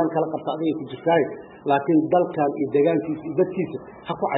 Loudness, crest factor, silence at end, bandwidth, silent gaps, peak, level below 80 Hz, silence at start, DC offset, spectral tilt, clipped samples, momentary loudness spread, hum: -23 LUFS; 16 dB; 0 s; 4 kHz; none; -8 dBFS; -64 dBFS; 0 s; under 0.1%; -11.5 dB/octave; under 0.1%; 9 LU; none